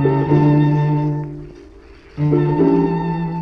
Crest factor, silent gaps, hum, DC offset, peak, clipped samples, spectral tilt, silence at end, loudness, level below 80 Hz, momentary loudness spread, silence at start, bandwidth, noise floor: 14 dB; none; none; under 0.1%; -2 dBFS; under 0.1%; -10.5 dB/octave; 0 s; -16 LUFS; -42 dBFS; 14 LU; 0 s; 5.2 kHz; -42 dBFS